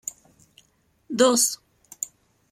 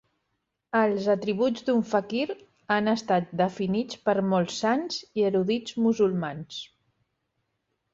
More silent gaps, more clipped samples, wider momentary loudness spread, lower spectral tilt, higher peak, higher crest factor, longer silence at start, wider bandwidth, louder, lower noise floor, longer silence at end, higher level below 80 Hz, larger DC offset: neither; neither; first, 18 LU vs 9 LU; second, -1.5 dB/octave vs -6 dB/octave; first, -6 dBFS vs -10 dBFS; about the same, 22 dB vs 18 dB; second, 0.05 s vs 0.75 s; first, 16.5 kHz vs 7.8 kHz; first, -22 LUFS vs -26 LUFS; second, -65 dBFS vs -79 dBFS; second, 0.45 s vs 1.3 s; about the same, -70 dBFS vs -68 dBFS; neither